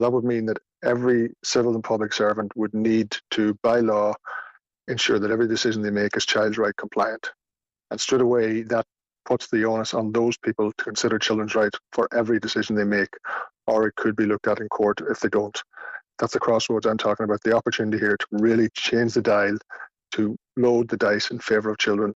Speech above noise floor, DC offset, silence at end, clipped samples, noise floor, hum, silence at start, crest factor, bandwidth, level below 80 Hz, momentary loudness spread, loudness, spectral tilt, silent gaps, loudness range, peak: over 67 dB; under 0.1%; 0.05 s; under 0.1%; under -90 dBFS; none; 0 s; 12 dB; 8 kHz; -62 dBFS; 8 LU; -23 LUFS; -4.5 dB/octave; none; 2 LU; -10 dBFS